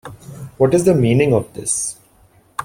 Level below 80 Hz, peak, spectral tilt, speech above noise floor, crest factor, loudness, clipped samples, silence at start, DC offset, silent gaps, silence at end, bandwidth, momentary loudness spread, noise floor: -48 dBFS; -2 dBFS; -5.5 dB/octave; 37 dB; 16 dB; -16 LUFS; under 0.1%; 0.05 s; under 0.1%; none; 0 s; 16.5 kHz; 21 LU; -52 dBFS